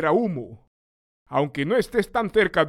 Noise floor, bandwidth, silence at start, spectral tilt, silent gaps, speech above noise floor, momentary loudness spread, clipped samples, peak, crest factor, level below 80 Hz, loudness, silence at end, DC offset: under -90 dBFS; 14.5 kHz; 0 s; -6.5 dB/octave; 0.67-1.26 s; over 68 dB; 9 LU; under 0.1%; -6 dBFS; 18 dB; -52 dBFS; -23 LUFS; 0 s; under 0.1%